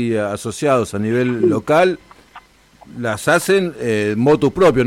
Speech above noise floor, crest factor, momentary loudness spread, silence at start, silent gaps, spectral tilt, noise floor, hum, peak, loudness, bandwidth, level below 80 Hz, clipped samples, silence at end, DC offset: 30 dB; 12 dB; 9 LU; 0 s; none; -5.5 dB/octave; -46 dBFS; none; -4 dBFS; -17 LUFS; 16 kHz; -48 dBFS; under 0.1%; 0 s; under 0.1%